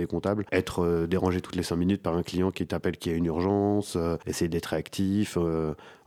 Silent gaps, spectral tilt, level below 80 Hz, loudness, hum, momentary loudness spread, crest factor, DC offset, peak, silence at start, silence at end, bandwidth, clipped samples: none; -6.5 dB/octave; -54 dBFS; -28 LUFS; none; 4 LU; 18 dB; under 0.1%; -8 dBFS; 0 s; 0.1 s; 16 kHz; under 0.1%